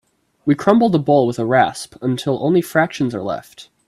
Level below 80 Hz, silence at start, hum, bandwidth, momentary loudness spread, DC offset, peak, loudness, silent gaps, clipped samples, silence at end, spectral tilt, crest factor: -56 dBFS; 0.45 s; none; 14.5 kHz; 11 LU; under 0.1%; 0 dBFS; -17 LUFS; none; under 0.1%; 0.25 s; -6.5 dB/octave; 18 dB